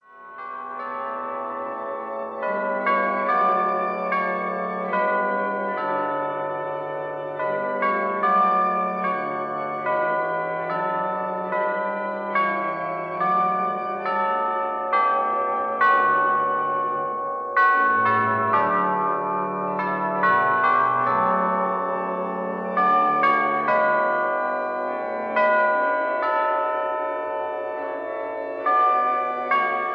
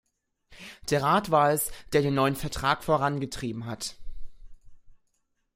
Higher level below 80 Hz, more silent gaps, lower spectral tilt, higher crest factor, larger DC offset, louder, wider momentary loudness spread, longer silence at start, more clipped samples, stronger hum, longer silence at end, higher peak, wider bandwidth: second, -78 dBFS vs -48 dBFS; neither; first, -7.5 dB/octave vs -5 dB/octave; about the same, 16 dB vs 20 dB; neither; first, -23 LUFS vs -26 LUFS; second, 10 LU vs 14 LU; second, 0.1 s vs 0.5 s; neither; neither; second, 0 s vs 0.6 s; about the same, -8 dBFS vs -8 dBFS; second, 5.6 kHz vs 16 kHz